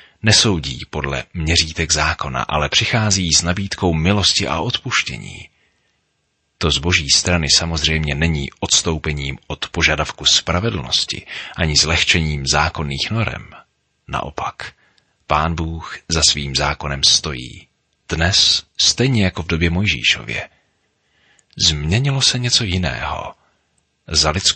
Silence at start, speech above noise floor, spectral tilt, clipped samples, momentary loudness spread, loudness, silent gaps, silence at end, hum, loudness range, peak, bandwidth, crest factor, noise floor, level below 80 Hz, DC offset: 0.25 s; 50 dB; -3 dB/octave; under 0.1%; 13 LU; -16 LUFS; none; 0 s; none; 4 LU; 0 dBFS; 8.8 kHz; 18 dB; -68 dBFS; -34 dBFS; under 0.1%